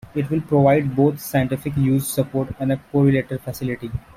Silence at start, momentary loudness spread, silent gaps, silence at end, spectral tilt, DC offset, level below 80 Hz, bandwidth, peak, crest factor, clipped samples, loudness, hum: 0.15 s; 10 LU; none; 0.15 s; -7 dB/octave; under 0.1%; -46 dBFS; 16.5 kHz; -4 dBFS; 16 dB; under 0.1%; -20 LUFS; none